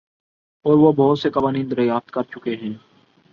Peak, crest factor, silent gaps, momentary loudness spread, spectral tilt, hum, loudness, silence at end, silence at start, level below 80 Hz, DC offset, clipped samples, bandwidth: -4 dBFS; 16 dB; none; 14 LU; -9 dB/octave; none; -19 LUFS; 0.55 s; 0.65 s; -58 dBFS; under 0.1%; under 0.1%; 6.6 kHz